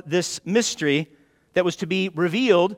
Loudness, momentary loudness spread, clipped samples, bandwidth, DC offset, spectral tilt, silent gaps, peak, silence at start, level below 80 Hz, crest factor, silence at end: -22 LUFS; 6 LU; under 0.1%; 16 kHz; under 0.1%; -4.5 dB/octave; none; -4 dBFS; 0.05 s; -64 dBFS; 18 dB; 0 s